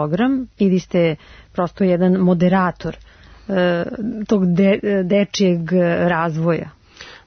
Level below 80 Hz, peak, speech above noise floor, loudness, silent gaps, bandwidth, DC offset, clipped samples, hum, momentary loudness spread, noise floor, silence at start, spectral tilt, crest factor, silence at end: -48 dBFS; -4 dBFS; 24 dB; -18 LUFS; none; 6.6 kHz; under 0.1%; under 0.1%; none; 10 LU; -41 dBFS; 0 s; -7 dB/octave; 12 dB; 0.1 s